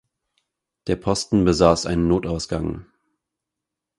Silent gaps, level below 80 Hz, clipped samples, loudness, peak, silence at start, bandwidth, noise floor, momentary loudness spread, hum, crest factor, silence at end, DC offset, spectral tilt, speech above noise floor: none; -40 dBFS; under 0.1%; -21 LUFS; 0 dBFS; 0.85 s; 11.5 kHz; -84 dBFS; 13 LU; none; 22 dB; 1.15 s; under 0.1%; -6 dB/octave; 64 dB